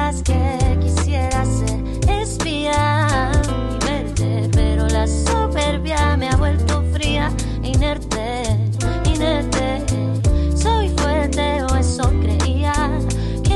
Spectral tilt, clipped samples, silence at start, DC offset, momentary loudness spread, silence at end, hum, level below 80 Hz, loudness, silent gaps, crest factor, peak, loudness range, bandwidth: -5.5 dB/octave; under 0.1%; 0 s; under 0.1%; 4 LU; 0 s; none; -22 dBFS; -19 LUFS; none; 10 dB; -6 dBFS; 1 LU; 12 kHz